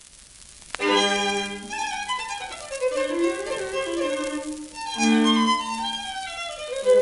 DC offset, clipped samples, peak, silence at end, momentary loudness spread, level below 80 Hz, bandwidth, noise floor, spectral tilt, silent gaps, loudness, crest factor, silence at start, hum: under 0.1%; under 0.1%; -6 dBFS; 0 s; 13 LU; -56 dBFS; 11.5 kHz; -47 dBFS; -3 dB/octave; none; -25 LUFS; 18 dB; 0.15 s; none